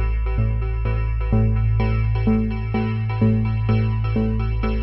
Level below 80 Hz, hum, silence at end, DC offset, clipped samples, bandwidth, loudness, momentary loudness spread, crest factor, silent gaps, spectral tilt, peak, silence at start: -24 dBFS; none; 0 s; under 0.1%; under 0.1%; 5.6 kHz; -21 LUFS; 4 LU; 12 dB; none; -11 dB/octave; -6 dBFS; 0 s